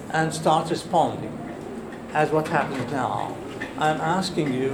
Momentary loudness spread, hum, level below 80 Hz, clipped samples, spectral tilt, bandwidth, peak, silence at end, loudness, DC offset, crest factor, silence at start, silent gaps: 12 LU; none; -54 dBFS; under 0.1%; -5.5 dB/octave; 20 kHz; -6 dBFS; 0 s; -25 LUFS; under 0.1%; 20 dB; 0 s; none